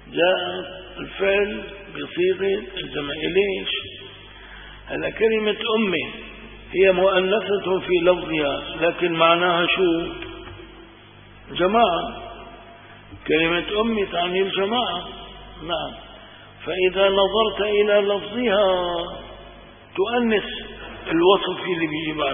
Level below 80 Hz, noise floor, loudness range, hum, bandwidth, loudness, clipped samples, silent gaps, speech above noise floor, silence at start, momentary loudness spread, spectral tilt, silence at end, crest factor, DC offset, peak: -48 dBFS; -46 dBFS; 5 LU; none; 3.7 kHz; -21 LUFS; under 0.1%; none; 25 dB; 0 s; 20 LU; -9.5 dB/octave; 0 s; 20 dB; under 0.1%; -2 dBFS